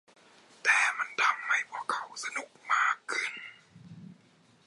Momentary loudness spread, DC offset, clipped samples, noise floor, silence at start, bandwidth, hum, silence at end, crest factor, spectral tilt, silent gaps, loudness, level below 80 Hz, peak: 17 LU; under 0.1%; under 0.1%; -63 dBFS; 0.65 s; 11.5 kHz; none; 0.55 s; 22 dB; -0.5 dB/octave; none; -29 LUFS; -86 dBFS; -10 dBFS